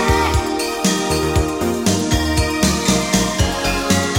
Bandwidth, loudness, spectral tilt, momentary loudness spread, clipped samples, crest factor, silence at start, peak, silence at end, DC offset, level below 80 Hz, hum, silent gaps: 16.5 kHz; -17 LUFS; -4 dB/octave; 3 LU; under 0.1%; 16 dB; 0 s; 0 dBFS; 0 s; 0.3%; -26 dBFS; none; none